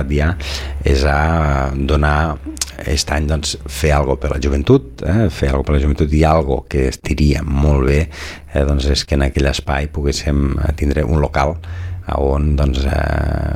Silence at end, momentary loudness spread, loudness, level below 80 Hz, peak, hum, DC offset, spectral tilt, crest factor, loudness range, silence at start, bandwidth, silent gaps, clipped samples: 0 s; 7 LU; -17 LUFS; -20 dBFS; 0 dBFS; none; under 0.1%; -6 dB/octave; 14 dB; 2 LU; 0 s; 14.5 kHz; none; under 0.1%